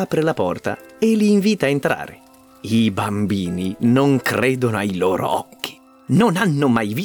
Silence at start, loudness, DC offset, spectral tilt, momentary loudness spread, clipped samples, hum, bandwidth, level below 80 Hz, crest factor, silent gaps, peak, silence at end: 0 s; -19 LUFS; under 0.1%; -6.5 dB/octave; 10 LU; under 0.1%; none; over 20 kHz; -56 dBFS; 14 dB; none; -4 dBFS; 0 s